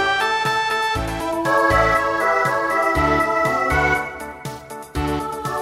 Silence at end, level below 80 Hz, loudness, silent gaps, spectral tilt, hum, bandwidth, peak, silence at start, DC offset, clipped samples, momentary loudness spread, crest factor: 0 s; -36 dBFS; -19 LUFS; none; -4.5 dB/octave; none; 16 kHz; -4 dBFS; 0 s; under 0.1%; under 0.1%; 14 LU; 16 dB